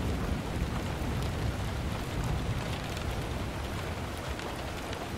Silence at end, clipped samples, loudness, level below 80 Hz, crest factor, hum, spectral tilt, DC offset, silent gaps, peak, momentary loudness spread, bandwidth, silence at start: 0 s; under 0.1%; -35 LUFS; -40 dBFS; 16 dB; none; -5.5 dB/octave; under 0.1%; none; -18 dBFS; 4 LU; 16 kHz; 0 s